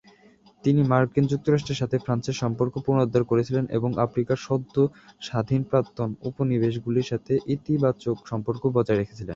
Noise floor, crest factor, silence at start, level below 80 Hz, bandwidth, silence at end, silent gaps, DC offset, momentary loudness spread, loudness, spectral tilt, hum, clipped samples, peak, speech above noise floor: -56 dBFS; 20 dB; 0.65 s; -54 dBFS; 7.6 kHz; 0 s; none; under 0.1%; 7 LU; -25 LUFS; -7.5 dB/octave; none; under 0.1%; -6 dBFS; 32 dB